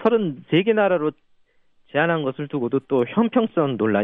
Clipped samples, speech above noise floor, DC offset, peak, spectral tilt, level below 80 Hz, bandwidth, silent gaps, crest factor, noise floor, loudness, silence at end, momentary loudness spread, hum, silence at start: under 0.1%; 38 dB; under 0.1%; -6 dBFS; -9.5 dB/octave; -66 dBFS; 3.9 kHz; none; 16 dB; -58 dBFS; -21 LUFS; 0 s; 7 LU; none; 0 s